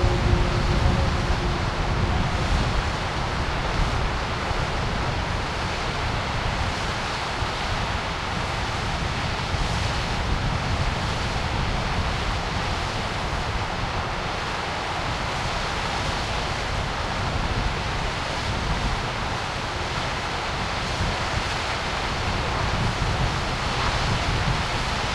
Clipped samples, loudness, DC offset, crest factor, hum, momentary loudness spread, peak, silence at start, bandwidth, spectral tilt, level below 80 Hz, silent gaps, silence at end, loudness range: under 0.1%; -25 LUFS; under 0.1%; 18 dB; none; 3 LU; -8 dBFS; 0 s; 12.5 kHz; -4.5 dB/octave; -30 dBFS; none; 0 s; 2 LU